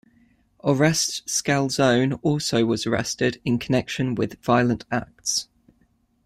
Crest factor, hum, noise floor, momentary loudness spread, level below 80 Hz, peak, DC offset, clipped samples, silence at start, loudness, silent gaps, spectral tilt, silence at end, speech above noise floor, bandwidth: 18 dB; none; -64 dBFS; 7 LU; -54 dBFS; -6 dBFS; under 0.1%; under 0.1%; 0.65 s; -23 LUFS; none; -4.5 dB/octave; 0.85 s; 42 dB; 15.5 kHz